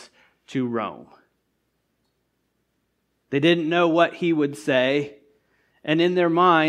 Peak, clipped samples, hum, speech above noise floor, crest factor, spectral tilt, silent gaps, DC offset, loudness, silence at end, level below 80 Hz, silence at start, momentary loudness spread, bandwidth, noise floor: -4 dBFS; under 0.1%; none; 52 dB; 20 dB; -6 dB/octave; none; under 0.1%; -21 LUFS; 0 s; -74 dBFS; 0 s; 12 LU; 11 kHz; -73 dBFS